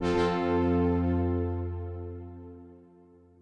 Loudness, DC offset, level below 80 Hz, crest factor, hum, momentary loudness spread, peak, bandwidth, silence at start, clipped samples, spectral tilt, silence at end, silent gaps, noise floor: -29 LUFS; under 0.1%; -52 dBFS; 14 dB; none; 20 LU; -16 dBFS; 8.8 kHz; 0 s; under 0.1%; -8 dB/octave; 0.65 s; none; -57 dBFS